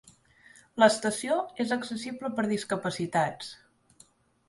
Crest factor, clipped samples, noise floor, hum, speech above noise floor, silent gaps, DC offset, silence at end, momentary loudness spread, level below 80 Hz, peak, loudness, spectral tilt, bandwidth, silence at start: 24 dB; under 0.1%; -61 dBFS; none; 33 dB; none; under 0.1%; 0.95 s; 13 LU; -70 dBFS; -6 dBFS; -28 LUFS; -4 dB/octave; 11.5 kHz; 0.75 s